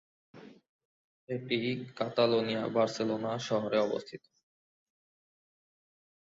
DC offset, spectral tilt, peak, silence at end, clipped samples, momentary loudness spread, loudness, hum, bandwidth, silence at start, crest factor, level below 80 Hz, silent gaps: under 0.1%; -5.5 dB/octave; -12 dBFS; 2.2 s; under 0.1%; 12 LU; -32 LUFS; none; 7.8 kHz; 0.35 s; 22 dB; -76 dBFS; 0.69-0.79 s, 0.85-1.27 s